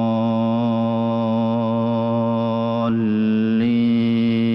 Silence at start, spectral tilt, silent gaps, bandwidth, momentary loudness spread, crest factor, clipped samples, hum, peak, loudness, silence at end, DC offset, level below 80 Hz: 0 s; -9.5 dB/octave; none; 5.8 kHz; 3 LU; 8 dB; under 0.1%; none; -12 dBFS; -19 LUFS; 0 s; under 0.1%; -62 dBFS